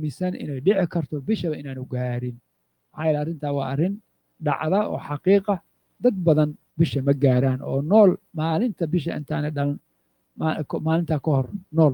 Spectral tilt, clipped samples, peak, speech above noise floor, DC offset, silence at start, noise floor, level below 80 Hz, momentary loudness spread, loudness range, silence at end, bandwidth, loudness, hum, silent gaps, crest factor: -9.5 dB/octave; under 0.1%; -4 dBFS; 47 dB; under 0.1%; 0 s; -69 dBFS; -60 dBFS; 9 LU; 6 LU; 0 s; 19 kHz; -24 LUFS; none; none; 18 dB